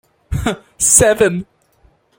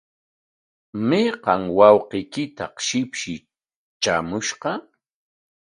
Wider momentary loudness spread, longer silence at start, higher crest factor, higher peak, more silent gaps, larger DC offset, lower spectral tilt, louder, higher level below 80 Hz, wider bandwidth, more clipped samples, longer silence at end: about the same, 16 LU vs 16 LU; second, 0.3 s vs 0.95 s; second, 16 dB vs 22 dB; about the same, 0 dBFS vs 0 dBFS; second, none vs 3.76-4.00 s; neither; about the same, -3 dB/octave vs -4 dB/octave; first, -13 LUFS vs -21 LUFS; first, -34 dBFS vs -58 dBFS; first, 17 kHz vs 10.5 kHz; neither; about the same, 0.75 s vs 0.85 s